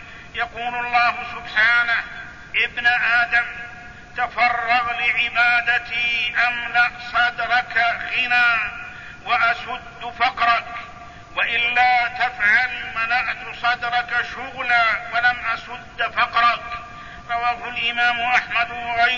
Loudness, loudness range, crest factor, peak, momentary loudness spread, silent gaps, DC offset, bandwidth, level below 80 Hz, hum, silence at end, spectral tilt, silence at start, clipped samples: -19 LUFS; 2 LU; 18 dB; -4 dBFS; 15 LU; none; 0.3%; 7.4 kHz; -50 dBFS; none; 0 s; -2.5 dB/octave; 0 s; under 0.1%